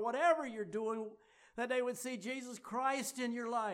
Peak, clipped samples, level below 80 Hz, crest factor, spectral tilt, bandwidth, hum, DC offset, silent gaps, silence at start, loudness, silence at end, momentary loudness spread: -20 dBFS; under 0.1%; -84 dBFS; 18 dB; -3.5 dB/octave; 16 kHz; none; under 0.1%; none; 0 s; -38 LUFS; 0 s; 11 LU